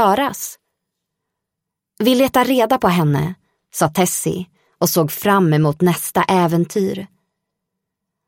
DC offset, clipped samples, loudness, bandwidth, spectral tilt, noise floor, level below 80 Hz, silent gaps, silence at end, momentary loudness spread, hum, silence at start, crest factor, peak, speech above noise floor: under 0.1%; under 0.1%; -17 LUFS; 16.5 kHz; -5 dB/octave; -81 dBFS; -54 dBFS; none; 1.2 s; 12 LU; none; 0 s; 16 dB; -2 dBFS; 65 dB